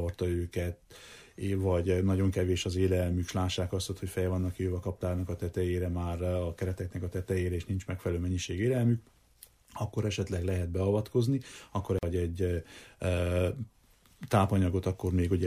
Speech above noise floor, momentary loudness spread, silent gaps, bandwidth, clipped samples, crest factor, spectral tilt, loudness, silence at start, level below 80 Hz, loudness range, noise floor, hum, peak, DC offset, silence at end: 28 dB; 9 LU; none; 15 kHz; under 0.1%; 18 dB; -6.5 dB/octave; -32 LUFS; 0 s; -48 dBFS; 3 LU; -59 dBFS; none; -12 dBFS; under 0.1%; 0 s